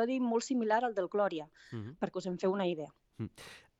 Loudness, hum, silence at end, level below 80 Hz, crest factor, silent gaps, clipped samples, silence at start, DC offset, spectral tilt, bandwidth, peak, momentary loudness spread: -34 LUFS; none; 0.2 s; -74 dBFS; 18 dB; none; under 0.1%; 0 s; under 0.1%; -5.5 dB/octave; 11.5 kHz; -16 dBFS; 14 LU